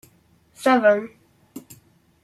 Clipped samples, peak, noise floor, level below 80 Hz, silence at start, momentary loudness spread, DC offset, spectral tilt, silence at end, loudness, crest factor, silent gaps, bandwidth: under 0.1%; -6 dBFS; -58 dBFS; -68 dBFS; 0.6 s; 25 LU; under 0.1%; -4.5 dB/octave; 0.65 s; -19 LUFS; 18 dB; none; 14.5 kHz